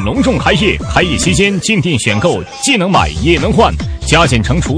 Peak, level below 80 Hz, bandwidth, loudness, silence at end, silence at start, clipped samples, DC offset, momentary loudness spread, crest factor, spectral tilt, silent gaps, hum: 0 dBFS; -24 dBFS; 10.5 kHz; -11 LUFS; 0 s; 0 s; under 0.1%; under 0.1%; 3 LU; 12 dB; -4.5 dB/octave; none; none